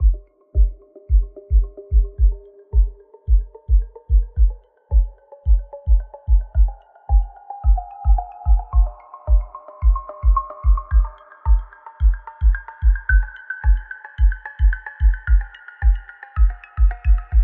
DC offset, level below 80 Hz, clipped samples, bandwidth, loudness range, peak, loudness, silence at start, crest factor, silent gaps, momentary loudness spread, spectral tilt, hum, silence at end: under 0.1%; -18 dBFS; under 0.1%; 2.7 kHz; 1 LU; -4 dBFS; -22 LUFS; 0 s; 12 dB; none; 8 LU; -7 dB/octave; none; 0 s